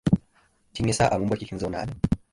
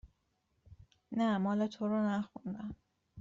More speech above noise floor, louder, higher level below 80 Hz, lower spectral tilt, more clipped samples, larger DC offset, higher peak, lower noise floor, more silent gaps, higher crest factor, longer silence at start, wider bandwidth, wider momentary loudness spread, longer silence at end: second, 38 dB vs 45 dB; first, -26 LUFS vs -35 LUFS; first, -42 dBFS vs -66 dBFS; about the same, -6 dB/octave vs -6.5 dB/octave; neither; neither; first, -6 dBFS vs -24 dBFS; second, -63 dBFS vs -79 dBFS; neither; about the same, 18 dB vs 14 dB; about the same, 0.05 s vs 0.05 s; first, 11.5 kHz vs 7.6 kHz; second, 8 LU vs 13 LU; first, 0.15 s vs 0 s